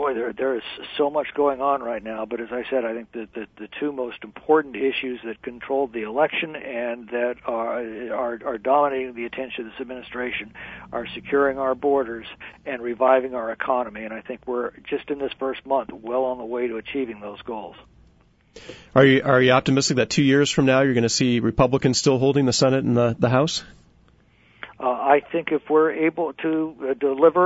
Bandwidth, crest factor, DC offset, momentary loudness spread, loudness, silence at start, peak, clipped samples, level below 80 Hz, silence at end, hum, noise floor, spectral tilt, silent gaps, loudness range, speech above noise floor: 8 kHz; 20 dB; under 0.1%; 15 LU; -22 LUFS; 0 s; -2 dBFS; under 0.1%; -52 dBFS; 0 s; none; -57 dBFS; -5 dB/octave; none; 8 LU; 35 dB